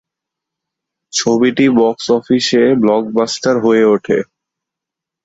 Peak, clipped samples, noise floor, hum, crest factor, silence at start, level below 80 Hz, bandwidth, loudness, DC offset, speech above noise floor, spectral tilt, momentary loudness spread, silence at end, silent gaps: -2 dBFS; under 0.1%; -83 dBFS; none; 14 dB; 1.15 s; -56 dBFS; 8 kHz; -13 LUFS; under 0.1%; 71 dB; -4.5 dB/octave; 6 LU; 1 s; none